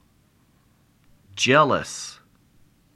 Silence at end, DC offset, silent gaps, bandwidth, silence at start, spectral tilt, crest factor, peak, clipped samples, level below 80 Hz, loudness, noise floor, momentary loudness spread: 0.8 s; under 0.1%; none; 14.5 kHz; 1.35 s; -3.5 dB/octave; 22 dB; -4 dBFS; under 0.1%; -62 dBFS; -20 LUFS; -61 dBFS; 20 LU